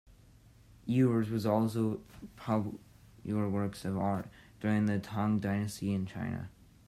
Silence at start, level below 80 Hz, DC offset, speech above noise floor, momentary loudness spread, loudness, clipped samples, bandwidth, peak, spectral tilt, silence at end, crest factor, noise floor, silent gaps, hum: 0.85 s; -64 dBFS; under 0.1%; 27 dB; 16 LU; -33 LUFS; under 0.1%; 14 kHz; -16 dBFS; -7.5 dB/octave; 0.4 s; 18 dB; -59 dBFS; none; none